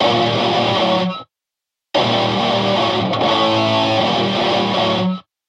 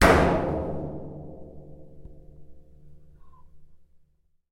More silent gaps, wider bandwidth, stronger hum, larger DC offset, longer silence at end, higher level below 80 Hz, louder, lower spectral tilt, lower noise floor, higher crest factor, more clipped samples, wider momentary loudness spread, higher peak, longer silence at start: neither; second, 11 kHz vs 16.5 kHz; neither; neither; second, 0.25 s vs 0.75 s; second, -54 dBFS vs -38 dBFS; first, -16 LUFS vs -25 LUFS; about the same, -5.5 dB/octave vs -5.5 dB/octave; first, -84 dBFS vs -64 dBFS; second, 14 dB vs 22 dB; neither; second, 4 LU vs 29 LU; about the same, -4 dBFS vs -6 dBFS; about the same, 0 s vs 0 s